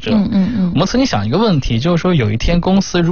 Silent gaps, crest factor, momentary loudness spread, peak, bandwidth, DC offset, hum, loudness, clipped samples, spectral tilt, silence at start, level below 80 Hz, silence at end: none; 10 dB; 2 LU; -2 dBFS; 7 kHz; 2%; none; -14 LUFS; under 0.1%; -6.5 dB/octave; 0 s; -26 dBFS; 0 s